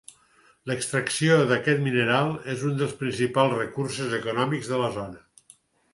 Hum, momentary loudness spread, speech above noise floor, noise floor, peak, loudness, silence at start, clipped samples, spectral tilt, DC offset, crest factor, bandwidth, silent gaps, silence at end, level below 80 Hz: none; 9 LU; 36 dB; -60 dBFS; -6 dBFS; -25 LUFS; 0.65 s; under 0.1%; -5 dB/octave; under 0.1%; 20 dB; 11.5 kHz; none; 0.75 s; -62 dBFS